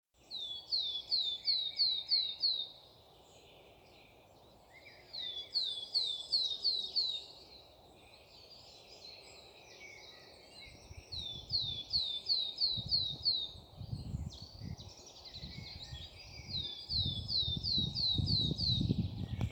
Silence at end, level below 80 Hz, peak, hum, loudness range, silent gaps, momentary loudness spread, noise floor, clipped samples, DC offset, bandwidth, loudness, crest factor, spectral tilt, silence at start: 0 s; -56 dBFS; -18 dBFS; none; 12 LU; none; 22 LU; -61 dBFS; under 0.1%; under 0.1%; over 20 kHz; -34 LUFS; 20 dB; -4.5 dB/octave; 0.3 s